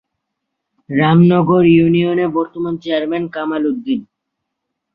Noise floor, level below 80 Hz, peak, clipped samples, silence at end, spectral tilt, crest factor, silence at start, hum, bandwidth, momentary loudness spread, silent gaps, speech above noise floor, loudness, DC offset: -76 dBFS; -52 dBFS; -2 dBFS; under 0.1%; 0.9 s; -10 dB/octave; 14 dB; 0.9 s; none; 5 kHz; 11 LU; none; 62 dB; -15 LUFS; under 0.1%